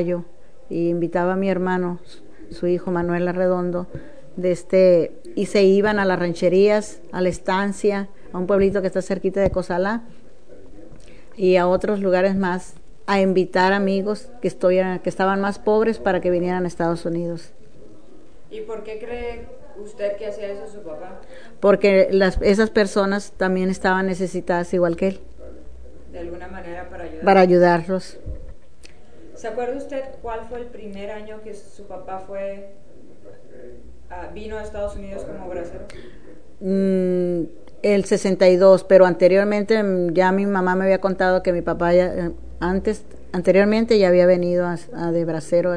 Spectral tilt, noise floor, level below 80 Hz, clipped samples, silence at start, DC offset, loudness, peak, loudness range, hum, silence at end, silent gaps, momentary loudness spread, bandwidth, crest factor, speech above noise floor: -6.5 dB/octave; -47 dBFS; -44 dBFS; under 0.1%; 0 s; 2%; -19 LUFS; 0 dBFS; 16 LU; none; 0 s; none; 19 LU; 10 kHz; 20 dB; 27 dB